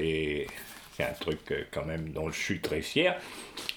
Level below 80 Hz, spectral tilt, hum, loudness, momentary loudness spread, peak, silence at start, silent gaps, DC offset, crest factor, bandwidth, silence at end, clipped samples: -52 dBFS; -4.5 dB/octave; none; -32 LUFS; 12 LU; -10 dBFS; 0 s; none; under 0.1%; 22 dB; over 20 kHz; 0 s; under 0.1%